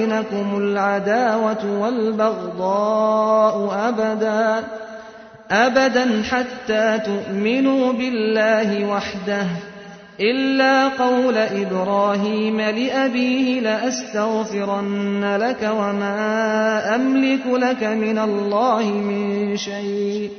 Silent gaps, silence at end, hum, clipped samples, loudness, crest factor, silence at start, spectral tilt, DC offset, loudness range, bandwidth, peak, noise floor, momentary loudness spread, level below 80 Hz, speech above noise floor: none; 0 s; none; under 0.1%; -19 LUFS; 16 dB; 0 s; -5 dB/octave; under 0.1%; 2 LU; 6.6 kHz; -4 dBFS; -40 dBFS; 6 LU; -60 dBFS; 21 dB